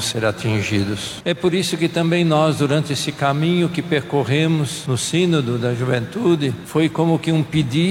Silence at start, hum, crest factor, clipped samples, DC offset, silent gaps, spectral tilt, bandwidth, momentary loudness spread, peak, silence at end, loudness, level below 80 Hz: 0 s; none; 14 dB; under 0.1%; under 0.1%; none; -5.5 dB/octave; 16 kHz; 4 LU; -4 dBFS; 0 s; -19 LUFS; -52 dBFS